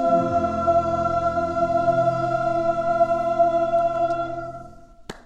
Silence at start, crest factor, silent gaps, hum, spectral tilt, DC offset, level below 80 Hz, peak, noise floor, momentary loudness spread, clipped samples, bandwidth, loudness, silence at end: 0 s; 14 dB; none; none; -7.5 dB/octave; under 0.1%; -48 dBFS; -8 dBFS; -43 dBFS; 8 LU; under 0.1%; 8.4 kHz; -21 LUFS; 0.05 s